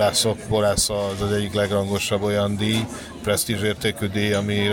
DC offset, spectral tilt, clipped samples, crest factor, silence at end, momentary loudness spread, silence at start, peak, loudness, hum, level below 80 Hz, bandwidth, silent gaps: under 0.1%; -4 dB/octave; under 0.1%; 14 dB; 0 s; 4 LU; 0 s; -8 dBFS; -22 LUFS; none; -44 dBFS; 17 kHz; none